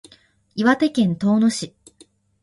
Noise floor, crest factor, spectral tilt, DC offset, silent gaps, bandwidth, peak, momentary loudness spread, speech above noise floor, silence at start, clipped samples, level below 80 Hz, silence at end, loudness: -55 dBFS; 18 dB; -5.5 dB/octave; under 0.1%; none; 11.5 kHz; -2 dBFS; 15 LU; 36 dB; 0.55 s; under 0.1%; -60 dBFS; 0.75 s; -19 LUFS